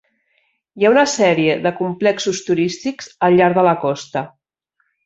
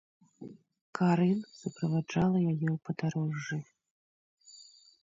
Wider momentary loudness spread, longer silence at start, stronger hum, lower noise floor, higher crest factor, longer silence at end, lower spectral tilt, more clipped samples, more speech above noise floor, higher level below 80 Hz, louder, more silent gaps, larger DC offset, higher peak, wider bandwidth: second, 12 LU vs 23 LU; first, 0.75 s vs 0.4 s; neither; first, -68 dBFS vs -57 dBFS; about the same, 16 dB vs 16 dB; first, 0.75 s vs 0.4 s; second, -5 dB/octave vs -7.5 dB/octave; neither; first, 52 dB vs 27 dB; first, -60 dBFS vs -68 dBFS; first, -16 LUFS vs -31 LUFS; second, none vs 0.81-0.93 s, 3.91-4.37 s; neither; first, -2 dBFS vs -16 dBFS; about the same, 8 kHz vs 7.6 kHz